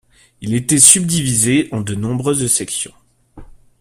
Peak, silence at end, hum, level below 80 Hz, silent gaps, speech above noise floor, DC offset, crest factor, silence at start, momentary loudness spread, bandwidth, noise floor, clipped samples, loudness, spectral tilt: 0 dBFS; 0.35 s; none; -46 dBFS; none; 24 dB; under 0.1%; 16 dB; 0.4 s; 15 LU; 16 kHz; -39 dBFS; 0.2%; -13 LUFS; -3.5 dB/octave